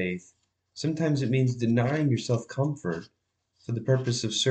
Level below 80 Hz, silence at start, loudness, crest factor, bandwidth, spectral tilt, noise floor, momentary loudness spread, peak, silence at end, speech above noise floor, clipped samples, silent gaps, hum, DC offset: -68 dBFS; 0 s; -27 LUFS; 16 dB; 8.8 kHz; -5.5 dB/octave; -67 dBFS; 11 LU; -12 dBFS; 0 s; 40 dB; under 0.1%; none; none; under 0.1%